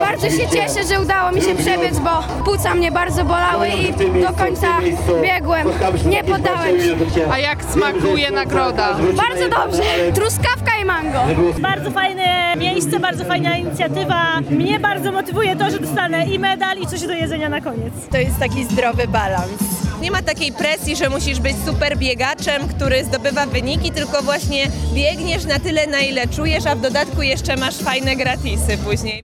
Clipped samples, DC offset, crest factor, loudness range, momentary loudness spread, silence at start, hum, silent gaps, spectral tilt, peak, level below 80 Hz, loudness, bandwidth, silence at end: under 0.1%; under 0.1%; 14 dB; 3 LU; 4 LU; 0 s; none; none; -4.5 dB/octave; -2 dBFS; -30 dBFS; -17 LUFS; 18 kHz; 0.05 s